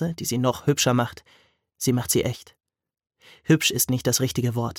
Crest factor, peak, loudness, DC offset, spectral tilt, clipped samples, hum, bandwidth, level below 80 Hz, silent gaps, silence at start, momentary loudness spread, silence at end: 18 dB; -6 dBFS; -23 LUFS; under 0.1%; -4 dB/octave; under 0.1%; none; 17.5 kHz; -56 dBFS; none; 0 s; 9 LU; 0 s